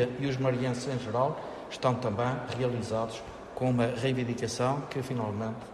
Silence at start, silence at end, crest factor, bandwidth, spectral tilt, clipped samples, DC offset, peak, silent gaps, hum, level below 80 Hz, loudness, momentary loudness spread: 0 s; 0 s; 18 dB; 12.5 kHz; -6 dB/octave; under 0.1%; under 0.1%; -12 dBFS; none; none; -58 dBFS; -31 LUFS; 7 LU